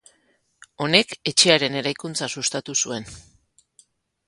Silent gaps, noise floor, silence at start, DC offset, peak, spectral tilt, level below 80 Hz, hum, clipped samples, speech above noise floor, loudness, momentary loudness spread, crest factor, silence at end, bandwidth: none; -65 dBFS; 0.8 s; under 0.1%; 0 dBFS; -2 dB/octave; -60 dBFS; none; under 0.1%; 43 dB; -20 LUFS; 13 LU; 24 dB; 1.05 s; 11.5 kHz